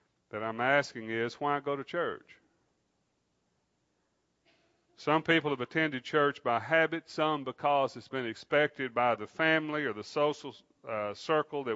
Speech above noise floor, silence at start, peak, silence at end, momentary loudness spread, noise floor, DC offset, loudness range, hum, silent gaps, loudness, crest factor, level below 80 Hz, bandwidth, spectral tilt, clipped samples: 46 dB; 0.35 s; -12 dBFS; 0 s; 10 LU; -77 dBFS; under 0.1%; 9 LU; none; none; -31 LUFS; 20 dB; -80 dBFS; 8 kHz; -5.5 dB/octave; under 0.1%